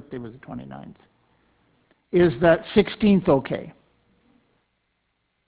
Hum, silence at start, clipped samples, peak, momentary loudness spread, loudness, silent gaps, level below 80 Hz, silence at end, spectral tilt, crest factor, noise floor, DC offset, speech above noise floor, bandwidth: none; 0.1 s; under 0.1%; -4 dBFS; 21 LU; -20 LUFS; none; -50 dBFS; 1.8 s; -11 dB/octave; 20 dB; -73 dBFS; under 0.1%; 52 dB; 4 kHz